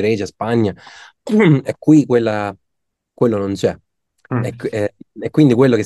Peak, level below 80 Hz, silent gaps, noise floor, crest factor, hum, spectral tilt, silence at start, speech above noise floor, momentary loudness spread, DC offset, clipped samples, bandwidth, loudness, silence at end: 0 dBFS; -58 dBFS; none; -75 dBFS; 16 dB; none; -7.5 dB/octave; 0 s; 60 dB; 13 LU; under 0.1%; under 0.1%; 12 kHz; -16 LUFS; 0 s